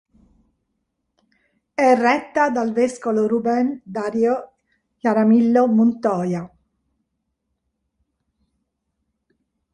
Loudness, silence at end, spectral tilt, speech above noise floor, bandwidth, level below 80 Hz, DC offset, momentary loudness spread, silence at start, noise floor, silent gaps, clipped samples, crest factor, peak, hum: -19 LUFS; 3.25 s; -7 dB/octave; 57 dB; 10.5 kHz; -64 dBFS; under 0.1%; 11 LU; 1.8 s; -75 dBFS; none; under 0.1%; 18 dB; -4 dBFS; none